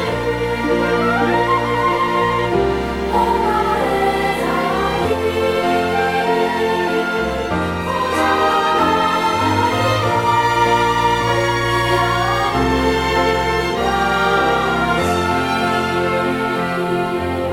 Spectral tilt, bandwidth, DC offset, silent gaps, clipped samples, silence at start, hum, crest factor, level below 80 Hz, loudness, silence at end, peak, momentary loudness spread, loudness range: -5 dB/octave; 17.5 kHz; under 0.1%; none; under 0.1%; 0 s; none; 14 dB; -34 dBFS; -17 LUFS; 0 s; -2 dBFS; 4 LU; 2 LU